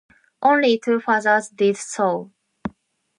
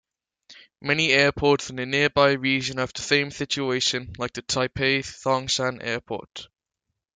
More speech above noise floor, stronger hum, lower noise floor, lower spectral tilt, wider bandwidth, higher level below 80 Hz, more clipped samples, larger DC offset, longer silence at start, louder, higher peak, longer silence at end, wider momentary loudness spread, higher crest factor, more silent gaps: second, 36 dB vs 58 dB; neither; second, -55 dBFS vs -82 dBFS; about the same, -4 dB/octave vs -3.5 dB/octave; first, 11.5 kHz vs 9.6 kHz; second, -62 dBFS vs -54 dBFS; neither; neither; about the same, 0.4 s vs 0.5 s; first, -19 LUFS vs -23 LUFS; about the same, -4 dBFS vs -4 dBFS; second, 0.5 s vs 0.7 s; first, 17 LU vs 13 LU; about the same, 18 dB vs 20 dB; neither